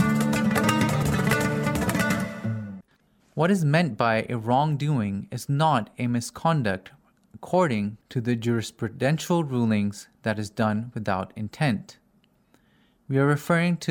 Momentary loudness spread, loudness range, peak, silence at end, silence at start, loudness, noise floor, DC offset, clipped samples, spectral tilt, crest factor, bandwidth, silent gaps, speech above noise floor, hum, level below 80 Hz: 9 LU; 4 LU; -6 dBFS; 0 s; 0 s; -25 LUFS; -64 dBFS; under 0.1%; under 0.1%; -6 dB/octave; 18 dB; 17.5 kHz; none; 39 dB; none; -52 dBFS